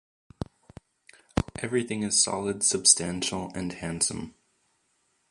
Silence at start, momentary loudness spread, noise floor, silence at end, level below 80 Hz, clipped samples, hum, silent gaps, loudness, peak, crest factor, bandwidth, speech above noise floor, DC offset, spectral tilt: 0.4 s; 21 LU; -72 dBFS; 1 s; -50 dBFS; under 0.1%; none; none; -25 LUFS; -4 dBFS; 26 dB; 11.5 kHz; 45 dB; under 0.1%; -2.5 dB/octave